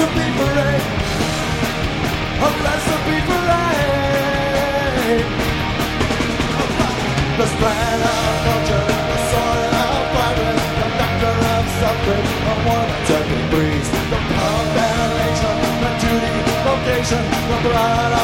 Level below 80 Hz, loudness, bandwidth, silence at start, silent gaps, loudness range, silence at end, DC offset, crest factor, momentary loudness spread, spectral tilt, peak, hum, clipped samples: -30 dBFS; -18 LUFS; 16.5 kHz; 0 s; none; 1 LU; 0 s; under 0.1%; 16 dB; 3 LU; -5 dB/octave; -2 dBFS; none; under 0.1%